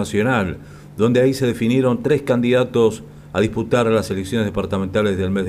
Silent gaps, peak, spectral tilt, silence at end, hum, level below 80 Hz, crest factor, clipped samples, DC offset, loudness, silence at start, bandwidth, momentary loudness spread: none; -4 dBFS; -6.5 dB/octave; 0 s; none; -46 dBFS; 14 dB; under 0.1%; under 0.1%; -19 LUFS; 0 s; 15 kHz; 7 LU